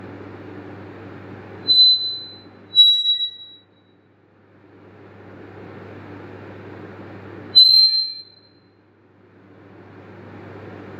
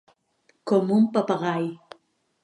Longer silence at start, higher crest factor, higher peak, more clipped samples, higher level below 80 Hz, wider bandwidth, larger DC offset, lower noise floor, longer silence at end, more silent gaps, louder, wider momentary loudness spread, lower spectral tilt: second, 0.05 s vs 0.65 s; about the same, 20 dB vs 18 dB; first, -2 dBFS vs -8 dBFS; neither; first, -68 dBFS vs -76 dBFS; first, 16 kHz vs 10 kHz; neither; second, -55 dBFS vs -66 dBFS; second, 0 s vs 0.7 s; neither; first, -13 LUFS vs -23 LUFS; first, 28 LU vs 16 LU; second, -3 dB/octave vs -7.5 dB/octave